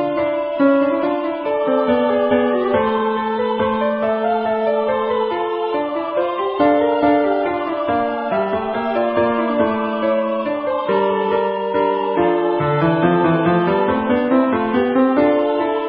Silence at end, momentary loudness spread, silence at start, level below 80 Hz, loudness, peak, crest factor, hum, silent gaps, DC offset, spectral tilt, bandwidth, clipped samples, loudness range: 0 s; 5 LU; 0 s; -50 dBFS; -18 LUFS; -2 dBFS; 14 dB; none; none; under 0.1%; -11.5 dB/octave; 5.2 kHz; under 0.1%; 3 LU